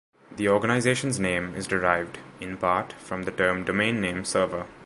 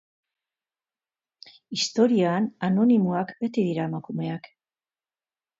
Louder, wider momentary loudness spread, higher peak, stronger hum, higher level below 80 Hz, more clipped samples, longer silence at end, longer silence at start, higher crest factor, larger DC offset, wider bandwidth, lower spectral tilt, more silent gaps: about the same, -25 LUFS vs -24 LUFS; about the same, 11 LU vs 11 LU; first, -4 dBFS vs -8 dBFS; neither; first, -52 dBFS vs -72 dBFS; neither; second, 0 s vs 1.15 s; second, 0.3 s vs 1.7 s; about the same, 22 dB vs 20 dB; neither; first, 11.5 kHz vs 7.8 kHz; second, -4.5 dB/octave vs -6 dB/octave; neither